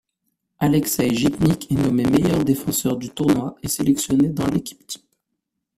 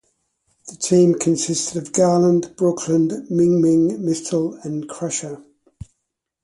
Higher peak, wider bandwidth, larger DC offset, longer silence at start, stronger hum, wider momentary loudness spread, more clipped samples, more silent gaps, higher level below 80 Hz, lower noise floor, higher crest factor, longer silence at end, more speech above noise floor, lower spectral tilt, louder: first, 0 dBFS vs -4 dBFS; first, 16 kHz vs 11.5 kHz; neither; about the same, 0.6 s vs 0.65 s; neither; second, 8 LU vs 12 LU; neither; neither; first, -46 dBFS vs -56 dBFS; about the same, -78 dBFS vs -78 dBFS; about the same, 20 dB vs 16 dB; second, 0.8 s vs 1.05 s; about the same, 59 dB vs 60 dB; about the same, -5.5 dB/octave vs -6 dB/octave; about the same, -20 LUFS vs -19 LUFS